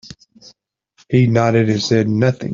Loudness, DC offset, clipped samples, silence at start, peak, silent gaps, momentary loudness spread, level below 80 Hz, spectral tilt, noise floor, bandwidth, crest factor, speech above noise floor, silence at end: -16 LUFS; under 0.1%; under 0.1%; 0.05 s; -2 dBFS; none; 3 LU; -52 dBFS; -6.5 dB/octave; -58 dBFS; 7.4 kHz; 16 dB; 44 dB; 0 s